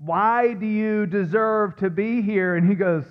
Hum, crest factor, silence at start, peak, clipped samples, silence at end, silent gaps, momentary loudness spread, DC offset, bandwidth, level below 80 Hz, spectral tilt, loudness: none; 12 dB; 0 s; -8 dBFS; under 0.1%; 0.05 s; none; 4 LU; under 0.1%; 5.6 kHz; -64 dBFS; -10.5 dB/octave; -21 LUFS